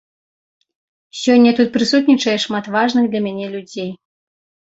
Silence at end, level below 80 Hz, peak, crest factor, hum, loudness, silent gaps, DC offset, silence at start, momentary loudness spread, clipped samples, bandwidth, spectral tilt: 0.75 s; -62 dBFS; -2 dBFS; 16 dB; none; -16 LUFS; none; under 0.1%; 1.15 s; 15 LU; under 0.1%; 8 kHz; -4.5 dB/octave